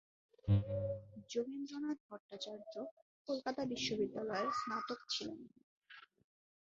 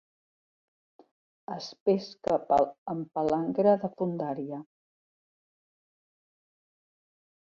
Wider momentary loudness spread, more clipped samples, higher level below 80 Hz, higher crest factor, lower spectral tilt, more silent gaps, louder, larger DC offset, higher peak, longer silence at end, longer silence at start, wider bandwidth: first, 19 LU vs 14 LU; neither; first, -60 dBFS vs -68 dBFS; about the same, 20 dB vs 20 dB; second, -5 dB/octave vs -7.5 dB/octave; first, 2.00-2.09 s, 2.20-2.29 s, 2.91-3.25 s, 5.63-5.82 s vs 1.80-1.86 s, 2.78-2.86 s; second, -41 LUFS vs -29 LUFS; neither; second, -22 dBFS vs -12 dBFS; second, 0.65 s vs 2.75 s; second, 0.45 s vs 1.5 s; about the same, 7.6 kHz vs 7.6 kHz